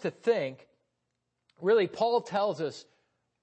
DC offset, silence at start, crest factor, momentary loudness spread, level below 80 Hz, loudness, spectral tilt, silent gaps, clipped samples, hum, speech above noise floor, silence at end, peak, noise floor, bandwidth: under 0.1%; 0 s; 16 dB; 11 LU; -82 dBFS; -29 LUFS; -5.5 dB/octave; none; under 0.1%; 60 Hz at -70 dBFS; 53 dB; 0.6 s; -14 dBFS; -82 dBFS; 8.6 kHz